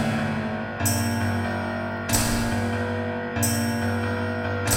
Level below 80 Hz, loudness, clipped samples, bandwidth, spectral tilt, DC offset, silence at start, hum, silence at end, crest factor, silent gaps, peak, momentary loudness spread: -42 dBFS; -25 LUFS; under 0.1%; 17.5 kHz; -4.5 dB/octave; under 0.1%; 0 s; none; 0 s; 18 dB; none; -8 dBFS; 5 LU